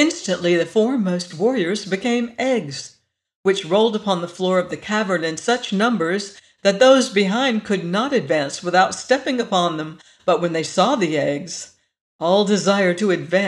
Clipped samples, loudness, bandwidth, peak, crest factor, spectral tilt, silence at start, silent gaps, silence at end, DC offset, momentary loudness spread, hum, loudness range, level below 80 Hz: under 0.1%; -19 LUFS; 11.5 kHz; -2 dBFS; 16 dB; -4.5 dB/octave; 0 s; 3.35-3.43 s, 12.01-12.19 s; 0 s; under 0.1%; 8 LU; none; 3 LU; -66 dBFS